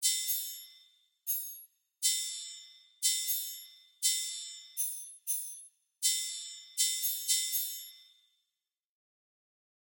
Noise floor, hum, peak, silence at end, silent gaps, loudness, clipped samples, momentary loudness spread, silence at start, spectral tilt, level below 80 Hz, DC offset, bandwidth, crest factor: -88 dBFS; none; -14 dBFS; 1.95 s; none; -32 LUFS; under 0.1%; 17 LU; 0 s; 11.5 dB/octave; under -90 dBFS; under 0.1%; 16.5 kHz; 22 dB